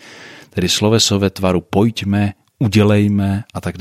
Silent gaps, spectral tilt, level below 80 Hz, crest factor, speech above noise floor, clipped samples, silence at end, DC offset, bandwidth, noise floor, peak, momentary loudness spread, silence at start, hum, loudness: none; -5 dB/octave; -48 dBFS; 14 dB; 24 dB; under 0.1%; 0 s; under 0.1%; 14.5 kHz; -39 dBFS; -2 dBFS; 10 LU; 0.05 s; none; -16 LUFS